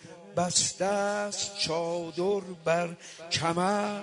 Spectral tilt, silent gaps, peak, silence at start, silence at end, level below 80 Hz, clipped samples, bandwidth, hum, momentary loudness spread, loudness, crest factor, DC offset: -3 dB/octave; none; -8 dBFS; 0 s; 0 s; -66 dBFS; under 0.1%; 11 kHz; none; 7 LU; -29 LUFS; 20 dB; under 0.1%